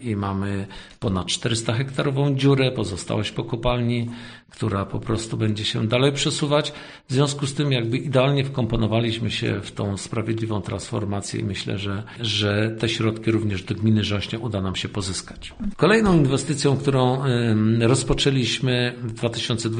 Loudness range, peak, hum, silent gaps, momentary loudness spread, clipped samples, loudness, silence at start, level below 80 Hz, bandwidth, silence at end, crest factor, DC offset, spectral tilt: 5 LU; -4 dBFS; none; none; 9 LU; under 0.1%; -23 LUFS; 0 s; -42 dBFS; 10 kHz; 0 s; 18 dB; under 0.1%; -5.5 dB/octave